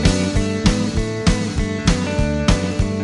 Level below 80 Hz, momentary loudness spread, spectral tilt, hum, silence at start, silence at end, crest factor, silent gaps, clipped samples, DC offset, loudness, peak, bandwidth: -24 dBFS; 3 LU; -5.5 dB/octave; none; 0 s; 0 s; 16 dB; none; under 0.1%; under 0.1%; -19 LUFS; 0 dBFS; 11.5 kHz